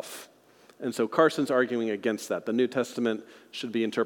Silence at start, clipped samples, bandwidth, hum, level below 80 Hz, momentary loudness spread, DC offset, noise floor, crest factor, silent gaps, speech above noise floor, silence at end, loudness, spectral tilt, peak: 0 s; under 0.1%; 18 kHz; none; -88 dBFS; 14 LU; under 0.1%; -58 dBFS; 20 dB; none; 30 dB; 0 s; -28 LUFS; -5 dB/octave; -8 dBFS